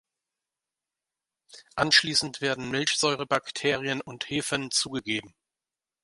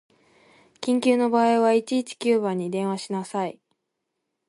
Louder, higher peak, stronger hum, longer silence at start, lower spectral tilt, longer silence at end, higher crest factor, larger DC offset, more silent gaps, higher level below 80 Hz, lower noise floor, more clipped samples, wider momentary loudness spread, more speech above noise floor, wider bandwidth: second, -26 LUFS vs -23 LUFS; first, -4 dBFS vs -8 dBFS; neither; first, 1.55 s vs 0.8 s; second, -2.5 dB/octave vs -5.5 dB/octave; second, 0.75 s vs 0.95 s; first, 24 dB vs 16 dB; neither; neither; first, -64 dBFS vs -76 dBFS; first, under -90 dBFS vs -80 dBFS; neither; about the same, 11 LU vs 10 LU; first, over 63 dB vs 57 dB; about the same, 11.5 kHz vs 11.5 kHz